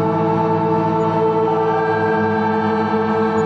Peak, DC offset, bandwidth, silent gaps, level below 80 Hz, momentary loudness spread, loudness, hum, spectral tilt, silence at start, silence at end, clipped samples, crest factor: -6 dBFS; under 0.1%; 7.4 kHz; none; -54 dBFS; 1 LU; -17 LUFS; none; -8.5 dB/octave; 0 s; 0 s; under 0.1%; 12 dB